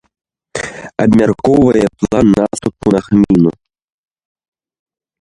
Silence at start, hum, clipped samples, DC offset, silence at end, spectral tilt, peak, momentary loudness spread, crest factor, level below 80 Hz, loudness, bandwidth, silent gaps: 0.55 s; none; under 0.1%; under 0.1%; 1.7 s; -7 dB/octave; 0 dBFS; 13 LU; 14 dB; -40 dBFS; -12 LUFS; 11.5 kHz; none